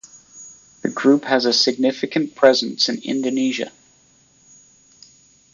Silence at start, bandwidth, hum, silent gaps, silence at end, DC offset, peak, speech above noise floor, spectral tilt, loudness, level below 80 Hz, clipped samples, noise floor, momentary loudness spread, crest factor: 0.35 s; 7.6 kHz; none; none; 1.85 s; under 0.1%; -2 dBFS; 37 dB; -3.5 dB/octave; -18 LUFS; -68 dBFS; under 0.1%; -56 dBFS; 15 LU; 20 dB